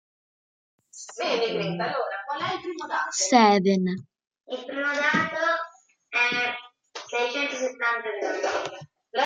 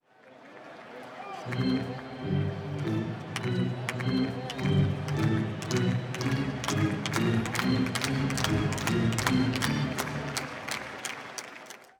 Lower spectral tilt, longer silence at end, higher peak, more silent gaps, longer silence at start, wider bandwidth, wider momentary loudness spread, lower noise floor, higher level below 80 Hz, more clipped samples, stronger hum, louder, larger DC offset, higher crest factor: second, -3.5 dB/octave vs -5.5 dB/octave; second, 0 s vs 0.15 s; first, -4 dBFS vs -8 dBFS; first, 4.27-4.31 s vs none; first, 0.95 s vs 0.25 s; second, 9.6 kHz vs over 20 kHz; first, 16 LU vs 13 LU; second, -48 dBFS vs -53 dBFS; second, -74 dBFS vs -54 dBFS; neither; neither; first, -25 LUFS vs -30 LUFS; neither; about the same, 24 dB vs 22 dB